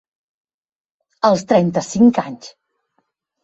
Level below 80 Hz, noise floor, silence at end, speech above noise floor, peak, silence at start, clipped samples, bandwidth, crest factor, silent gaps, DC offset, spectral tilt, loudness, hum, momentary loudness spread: -58 dBFS; -69 dBFS; 0.95 s; 54 dB; -2 dBFS; 1.25 s; under 0.1%; 8 kHz; 18 dB; none; under 0.1%; -6 dB/octave; -16 LUFS; none; 14 LU